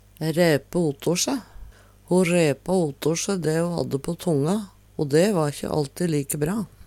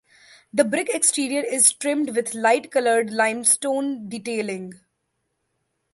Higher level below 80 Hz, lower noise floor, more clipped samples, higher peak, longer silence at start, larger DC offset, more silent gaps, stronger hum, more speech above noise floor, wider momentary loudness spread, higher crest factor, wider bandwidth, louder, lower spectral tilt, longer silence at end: first, -52 dBFS vs -72 dBFS; second, -45 dBFS vs -75 dBFS; neither; second, -6 dBFS vs -2 dBFS; second, 0.2 s vs 0.55 s; neither; neither; neither; second, 22 dB vs 53 dB; second, 7 LU vs 12 LU; about the same, 18 dB vs 20 dB; first, 16.5 kHz vs 12 kHz; about the same, -23 LUFS vs -21 LUFS; first, -5.5 dB/octave vs -2 dB/octave; second, 0.2 s vs 1.2 s